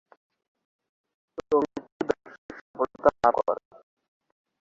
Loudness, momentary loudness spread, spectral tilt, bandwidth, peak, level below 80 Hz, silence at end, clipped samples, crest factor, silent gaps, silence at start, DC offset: -27 LUFS; 21 LU; -6.5 dB/octave; 7.6 kHz; -4 dBFS; -62 dBFS; 1.1 s; under 0.1%; 24 dB; 1.92-2.00 s, 2.38-2.49 s, 2.61-2.74 s; 1.5 s; under 0.1%